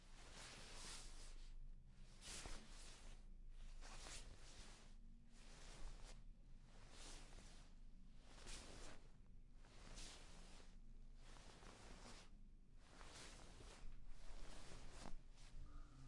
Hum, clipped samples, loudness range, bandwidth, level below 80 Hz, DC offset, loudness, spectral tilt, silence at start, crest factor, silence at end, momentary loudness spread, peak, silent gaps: none; under 0.1%; 4 LU; 11.5 kHz; -60 dBFS; under 0.1%; -62 LUFS; -3 dB/octave; 0 s; 20 dB; 0 s; 11 LU; -36 dBFS; none